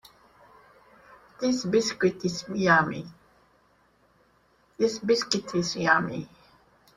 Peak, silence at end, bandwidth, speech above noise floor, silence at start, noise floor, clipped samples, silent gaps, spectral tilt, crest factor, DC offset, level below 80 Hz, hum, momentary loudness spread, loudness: -6 dBFS; 0.7 s; 13 kHz; 39 dB; 1.4 s; -64 dBFS; under 0.1%; none; -4.5 dB/octave; 22 dB; under 0.1%; -64 dBFS; none; 14 LU; -25 LUFS